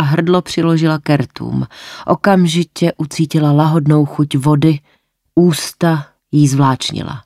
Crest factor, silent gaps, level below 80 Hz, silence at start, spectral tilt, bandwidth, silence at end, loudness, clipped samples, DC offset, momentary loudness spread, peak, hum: 12 dB; none; -50 dBFS; 0 s; -6.5 dB/octave; 14.5 kHz; 0.05 s; -14 LUFS; under 0.1%; under 0.1%; 9 LU; -2 dBFS; none